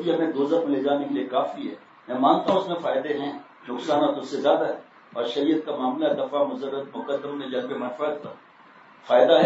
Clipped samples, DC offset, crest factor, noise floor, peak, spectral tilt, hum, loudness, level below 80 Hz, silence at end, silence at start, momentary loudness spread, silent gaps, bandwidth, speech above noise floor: under 0.1%; under 0.1%; 20 dB; -51 dBFS; -6 dBFS; -6 dB/octave; none; -25 LUFS; -78 dBFS; 0 s; 0 s; 13 LU; none; 8 kHz; 27 dB